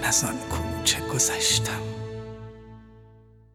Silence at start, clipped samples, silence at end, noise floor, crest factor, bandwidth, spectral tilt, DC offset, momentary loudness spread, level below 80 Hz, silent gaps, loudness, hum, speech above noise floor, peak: 0 s; under 0.1%; 0.4 s; -52 dBFS; 20 dB; 19 kHz; -2 dB/octave; under 0.1%; 18 LU; -46 dBFS; none; -24 LUFS; none; 27 dB; -8 dBFS